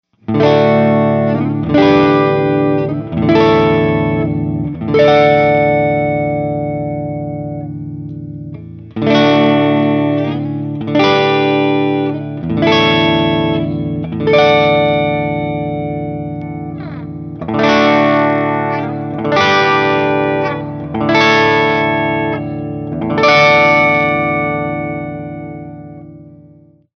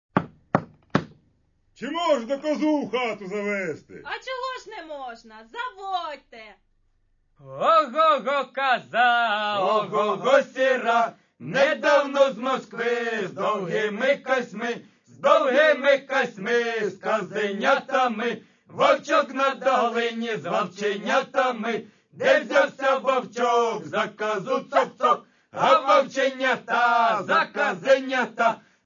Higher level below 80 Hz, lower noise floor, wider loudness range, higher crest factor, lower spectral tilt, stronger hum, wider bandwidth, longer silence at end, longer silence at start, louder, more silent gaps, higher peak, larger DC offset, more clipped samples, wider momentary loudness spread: first, -42 dBFS vs -70 dBFS; second, -44 dBFS vs -65 dBFS; second, 4 LU vs 7 LU; second, 14 dB vs 20 dB; first, -7 dB/octave vs -4.5 dB/octave; neither; second, 6.6 kHz vs 7.4 kHz; first, 0.6 s vs 0.25 s; first, 0.3 s vs 0.15 s; first, -13 LUFS vs -23 LUFS; neither; first, 0 dBFS vs -4 dBFS; neither; neither; first, 15 LU vs 12 LU